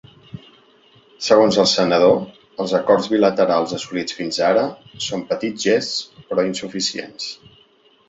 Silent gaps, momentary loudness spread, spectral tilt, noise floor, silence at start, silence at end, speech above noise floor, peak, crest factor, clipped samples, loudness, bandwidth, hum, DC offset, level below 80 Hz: none; 15 LU; -4 dB/octave; -55 dBFS; 0.35 s; 0.75 s; 36 dB; -2 dBFS; 18 dB; under 0.1%; -19 LUFS; 8 kHz; none; under 0.1%; -60 dBFS